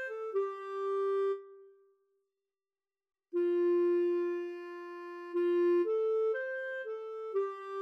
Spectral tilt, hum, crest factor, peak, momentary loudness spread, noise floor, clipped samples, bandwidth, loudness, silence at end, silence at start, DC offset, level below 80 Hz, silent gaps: -5 dB/octave; none; 10 dB; -24 dBFS; 13 LU; under -90 dBFS; under 0.1%; 5 kHz; -33 LUFS; 0 s; 0 s; under 0.1%; under -90 dBFS; none